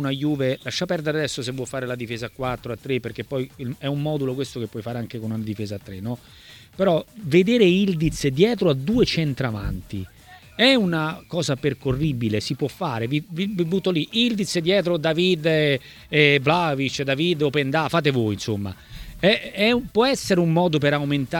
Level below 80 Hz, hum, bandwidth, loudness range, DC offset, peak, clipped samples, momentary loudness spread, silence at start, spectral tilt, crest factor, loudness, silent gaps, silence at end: -46 dBFS; none; 18.5 kHz; 8 LU; under 0.1%; -2 dBFS; under 0.1%; 12 LU; 0 s; -5.5 dB/octave; 20 dB; -22 LUFS; none; 0 s